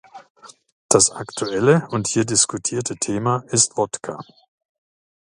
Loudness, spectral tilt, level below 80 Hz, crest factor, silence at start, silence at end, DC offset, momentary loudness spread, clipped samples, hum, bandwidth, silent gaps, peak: -19 LUFS; -3.5 dB/octave; -58 dBFS; 22 dB; 0.15 s; 1.05 s; under 0.1%; 11 LU; under 0.1%; none; 11.5 kHz; 0.30-0.35 s, 0.72-0.89 s; 0 dBFS